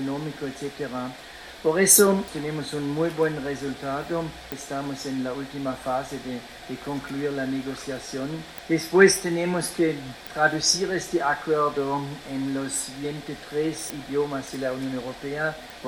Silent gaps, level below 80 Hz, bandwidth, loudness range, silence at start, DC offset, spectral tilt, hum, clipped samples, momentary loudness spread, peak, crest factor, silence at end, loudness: none; -56 dBFS; 16 kHz; 8 LU; 0 s; under 0.1%; -3.5 dB/octave; none; under 0.1%; 14 LU; -2 dBFS; 24 dB; 0 s; -25 LUFS